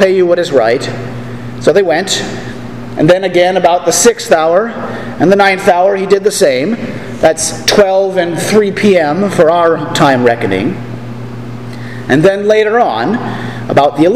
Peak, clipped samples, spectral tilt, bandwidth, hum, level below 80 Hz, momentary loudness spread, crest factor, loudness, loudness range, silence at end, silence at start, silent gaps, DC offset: 0 dBFS; 0.7%; -4.5 dB/octave; 16 kHz; none; -42 dBFS; 15 LU; 10 dB; -10 LUFS; 3 LU; 0 s; 0 s; none; 2%